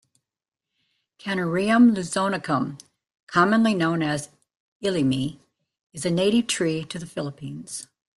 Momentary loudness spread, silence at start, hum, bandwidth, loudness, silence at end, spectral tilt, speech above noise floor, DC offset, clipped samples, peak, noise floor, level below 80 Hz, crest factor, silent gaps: 16 LU; 1.25 s; none; 12 kHz; -23 LUFS; 0.35 s; -5 dB/octave; 66 dB; under 0.1%; under 0.1%; -6 dBFS; -88 dBFS; -62 dBFS; 18 dB; 3.23-3.27 s, 4.60-4.80 s, 5.83-5.90 s